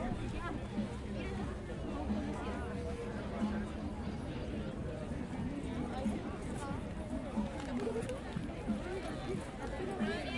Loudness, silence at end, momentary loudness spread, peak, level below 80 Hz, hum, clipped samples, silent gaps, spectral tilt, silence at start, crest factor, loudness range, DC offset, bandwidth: -40 LUFS; 0 s; 4 LU; -24 dBFS; -48 dBFS; none; under 0.1%; none; -6.5 dB/octave; 0 s; 14 dB; 1 LU; under 0.1%; 11.5 kHz